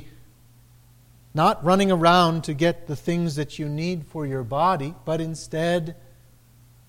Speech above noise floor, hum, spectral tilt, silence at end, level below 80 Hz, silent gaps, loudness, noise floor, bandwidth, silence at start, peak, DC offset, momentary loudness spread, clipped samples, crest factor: 31 dB; none; -6 dB/octave; 0.95 s; -50 dBFS; none; -23 LUFS; -53 dBFS; 16 kHz; 0 s; -4 dBFS; under 0.1%; 12 LU; under 0.1%; 20 dB